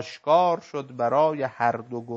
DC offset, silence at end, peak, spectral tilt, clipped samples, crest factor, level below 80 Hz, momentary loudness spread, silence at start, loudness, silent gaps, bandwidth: under 0.1%; 0 s; -8 dBFS; -6 dB/octave; under 0.1%; 16 dB; -74 dBFS; 10 LU; 0 s; -24 LUFS; none; 7.6 kHz